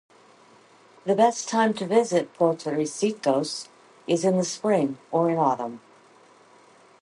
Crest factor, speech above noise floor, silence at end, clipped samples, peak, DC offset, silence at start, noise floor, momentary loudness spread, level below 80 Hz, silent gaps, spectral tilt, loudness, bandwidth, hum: 20 dB; 31 dB; 1.25 s; under 0.1%; -6 dBFS; under 0.1%; 1.05 s; -54 dBFS; 14 LU; -76 dBFS; none; -5 dB/octave; -24 LUFS; 11.5 kHz; none